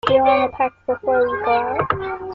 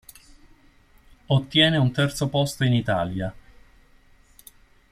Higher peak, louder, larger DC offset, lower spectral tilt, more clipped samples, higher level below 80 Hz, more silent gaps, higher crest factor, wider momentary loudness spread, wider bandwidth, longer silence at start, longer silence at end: about the same, -2 dBFS vs -4 dBFS; first, -19 LUFS vs -22 LUFS; neither; first, -7 dB/octave vs -5.5 dB/octave; neither; about the same, -50 dBFS vs -50 dBFS; neither; about the same, 18 dB vs 20 dB; about the same, 8 LU vs 10 LU; second, 7.4 kHz vs 15.5 kHz; second, 0.05 s vs 1.3 s; second, 0 s vs 1.55 s